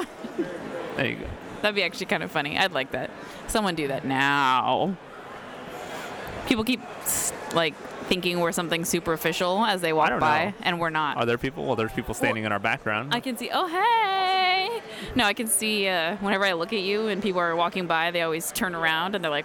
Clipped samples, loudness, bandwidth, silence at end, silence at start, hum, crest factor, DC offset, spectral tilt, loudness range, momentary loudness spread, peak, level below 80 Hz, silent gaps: under 0.1%; -25 LUFS; over 20 kHz; 0 s; 0 s; none; 20 dB; under 0.1%; -3 dB/octave; 3 LU; 12 LU; -6 dBFS; -52 dBFS; none